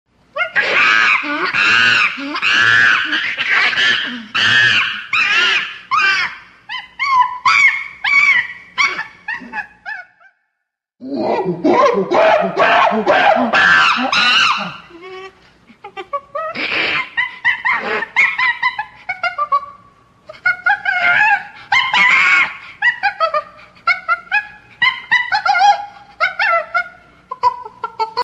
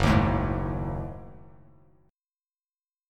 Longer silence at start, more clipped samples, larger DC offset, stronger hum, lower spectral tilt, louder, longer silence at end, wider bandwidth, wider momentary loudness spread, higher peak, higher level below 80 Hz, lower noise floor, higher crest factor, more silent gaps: first, 0.35 s vs 0 s; neither; neither; neither; second, -2.5 dB/octave vs -7 dB/octave; first, -13 LUFS vs -28 LUFS; second, 0 s vs 1.7 s; about the same, 12 kHz vs 13 kHz; second, 16 LU vs 21 LU; first, 0 dBFS vs -8 dBFS; second, -58 dBFS vs -38 dBFS; second, -76 dBFS vs under -90 dBFS; second, 16 dB vs 22 dB; neither